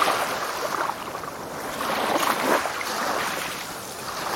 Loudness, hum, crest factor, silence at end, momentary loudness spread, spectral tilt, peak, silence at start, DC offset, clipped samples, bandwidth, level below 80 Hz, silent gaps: -26 LUFS; none; 20 dB; 0 s; 10 LU; -2 dB/octave; -6 dBFS; 0 s; under 0.1%; under 0.1%; 17 kHz; -58 dBFS; none